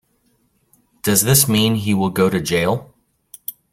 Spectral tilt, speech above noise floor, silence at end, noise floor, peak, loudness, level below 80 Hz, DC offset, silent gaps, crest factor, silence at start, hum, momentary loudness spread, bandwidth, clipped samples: -4 dB/octave; 46 dB; 0.2 s; -63 dBFS; 0 dBFS; -16 LUFS; -50 dBFS; under 0.1%; none; 18 dB; 1.05 s; none; 17 LU; 16.5 kHz; under 0.1%